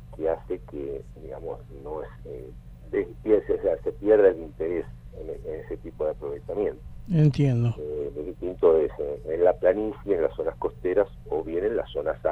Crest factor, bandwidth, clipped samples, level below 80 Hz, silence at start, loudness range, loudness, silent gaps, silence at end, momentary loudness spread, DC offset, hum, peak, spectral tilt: 20 dB; 6.6 kHz; under 0.1%; -46 dBFS; 0 s; 5 LU; -26 LUFS; none; 0 s; 17 LU; under 0.1%; none; -6 dBFS; -9.5 dB/octave